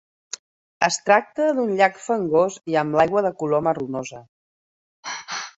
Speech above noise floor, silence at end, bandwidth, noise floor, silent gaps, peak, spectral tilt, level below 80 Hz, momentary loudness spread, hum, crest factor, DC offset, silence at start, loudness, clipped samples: over 69 dB; 0.1 s; 8.4 kHz; under -90 dBFS; 4.29-5.03 s; -2 dBFS; -4 dB/octave; -64 dBFS; 18 LU; none; 20 dB; under 0.1%; 0.8 s; -21 LUFS; under 0.1%